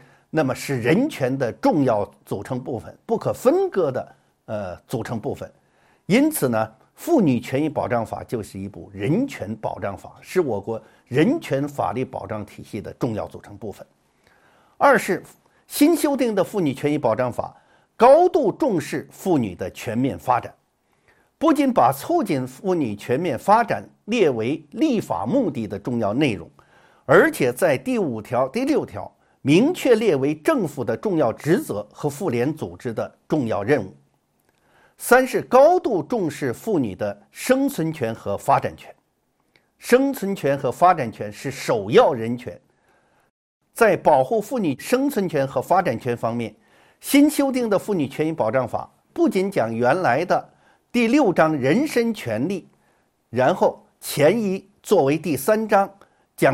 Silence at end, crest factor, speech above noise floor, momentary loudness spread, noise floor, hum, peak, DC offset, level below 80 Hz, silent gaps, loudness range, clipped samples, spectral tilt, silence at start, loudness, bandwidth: 0 s; 20 dB; 48 dB; 14 LU; -68 dBFS; none; -2 dBFS; under 0.1%; -60 dBFS; 43.30-43.61 s; 5 LU; under 0.1%; -6 dB/octave; 0.35 s; -21 LUFS; 16.5 kHz